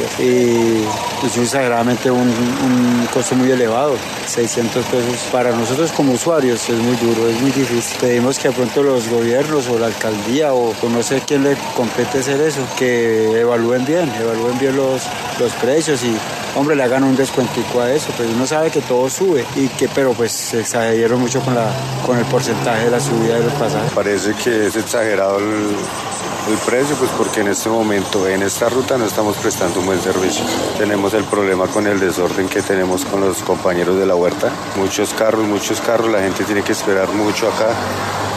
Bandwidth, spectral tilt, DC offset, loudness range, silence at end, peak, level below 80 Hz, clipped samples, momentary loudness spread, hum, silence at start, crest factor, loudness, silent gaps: 14 kHz; -4.5 dB/octave; under 0.1%; 1 LU; 0 s; 0 dBFS; -54 dBFS; under 0.1%; 4 LU; none; 0 s; 16 dB; -16 LUFS; none